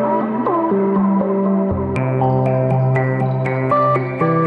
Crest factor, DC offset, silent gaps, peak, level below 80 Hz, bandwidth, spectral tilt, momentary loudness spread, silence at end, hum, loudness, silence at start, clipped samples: 12 dB; under 0.1%; none; -4 dBFS; -48 dBFS; 4.7 kHz; -10.5 dB/octave; 3 LU; 0 s; none; -17 LUFS; 0 s; under 0.1%